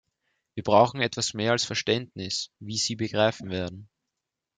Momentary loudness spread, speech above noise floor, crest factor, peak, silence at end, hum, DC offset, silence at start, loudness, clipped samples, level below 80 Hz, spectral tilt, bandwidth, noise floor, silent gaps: 12 LU; 59 dB; 22 dB; -4 dBFS; 0.7 s; none; under 0.1%; 0.55 s; -26 LUFS; under 0.1%; -66 dBFS; -3.5 dB/octave; 9.6 kHz; -85 dBFS; none